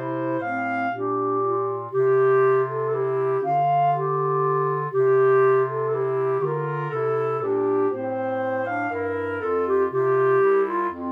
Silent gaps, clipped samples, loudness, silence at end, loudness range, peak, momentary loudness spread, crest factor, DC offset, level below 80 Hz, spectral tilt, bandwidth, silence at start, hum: none; under 0.1%; -22 LUFS; 0 s; 3 LU; -10 dBFS; 7 LU; 12 dB; under 0.1%; -70 dBFS; -9.5 dB/octave; 3.7 kHz; 0 s; 50 Hz at -65 dBFS